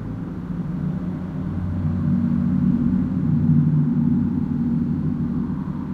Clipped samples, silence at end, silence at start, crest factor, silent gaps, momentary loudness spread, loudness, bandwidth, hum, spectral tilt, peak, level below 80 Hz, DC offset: under 0.1%; 0 s; 0 s; 14 dB; none; 9 LU; -22 LUFS; 3.9 kHz; none; -11.5 dB/octave; -6 dBFS; -40 dBFS; under 0.1%